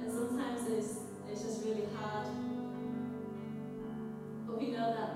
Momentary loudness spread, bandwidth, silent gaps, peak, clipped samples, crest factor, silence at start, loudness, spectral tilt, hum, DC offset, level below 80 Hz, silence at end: 8 LU; 15.5 kHz; none; -24 dBFS; under 0.1%; 14 dB; 0 s; -39 LUFS; -5.5 dB/octave; none; under 0.1%; -72 dBFS; 0 s